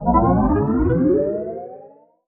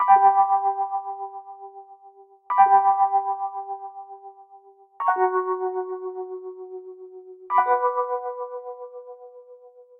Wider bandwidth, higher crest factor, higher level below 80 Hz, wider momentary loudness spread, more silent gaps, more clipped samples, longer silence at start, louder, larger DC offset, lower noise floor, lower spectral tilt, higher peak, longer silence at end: second, 2.6 kHz vs 3.1 kHz; about the same, 16 dB vs 20 dB; first, -30 dBFS vs under -90 dBFS; second, 15 LU vs 25 LU; neither; neither; about the same, 0 s vs 0 s; first, -18 LUFS vs -22 LUFS; neither; second, -46 dBFS vs -51 dBFS; first, -12 dB/octave vs -2.5 dB/octave; about the same, -2 dBFS vs -4 dBFS; first, 0.4 s vs 0.2 s